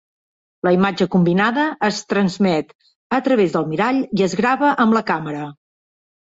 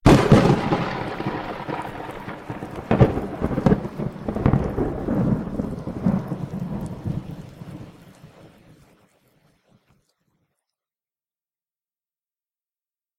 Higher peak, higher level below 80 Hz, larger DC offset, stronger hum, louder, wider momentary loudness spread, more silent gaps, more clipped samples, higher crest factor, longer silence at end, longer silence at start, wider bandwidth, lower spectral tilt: about the same, -4 dBFS vs -2 dBFS; second, -58 dBFS vs -38 dBFS; neither; neither; first, -18 LUFS vs -23 LUFS; second, 7 LU vs 16 LU; first, 2.75-2.79 s, 2.95-3.10 s vs none; neither; second, 14 dB vs 22 dB; second, 0.8 s vs 4.75 s; first, 0.65 s vs 0.05 s; second, 8 kHz vs 14.5 kHz; second, -6 dB/octave vs -7.5 dB/octave